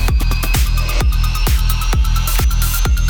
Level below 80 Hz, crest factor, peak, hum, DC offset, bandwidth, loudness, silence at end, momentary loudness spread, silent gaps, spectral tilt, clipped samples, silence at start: -14 dBFS; 8 dB; -4 dBFS; none; under 0.1%; over 20 kHz; -17 LUFS; 0 s; 1 LU; none; -4 dB/octave; under 0.1%; 0 s